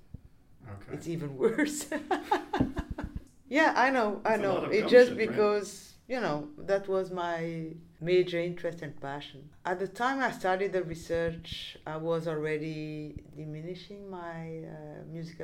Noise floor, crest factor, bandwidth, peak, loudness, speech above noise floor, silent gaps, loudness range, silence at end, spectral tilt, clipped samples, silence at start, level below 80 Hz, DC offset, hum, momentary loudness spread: -55 dBFS; 24 dB; 15.5 kHz; -8 dBFS; -30 LUFS; 25 dB; none; 10 LU; 0 s; -5.5 dB/octave; under 0.1%; 0.25 s; -54 dBFS; under 0.1%; none; 17 LU